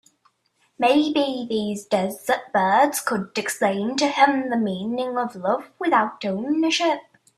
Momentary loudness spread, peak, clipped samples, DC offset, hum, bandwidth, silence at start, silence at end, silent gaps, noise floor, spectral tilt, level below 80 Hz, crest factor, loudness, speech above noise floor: 7 LU; -2 dBFS; under 0.1%; under 0.1%; none; 15.5 kHz; 0.8 s; 0.35 s; none; -67 dBFS; -4 dB/octave; -68 dBFS; 20 dB; -22 LUFS; 45 dB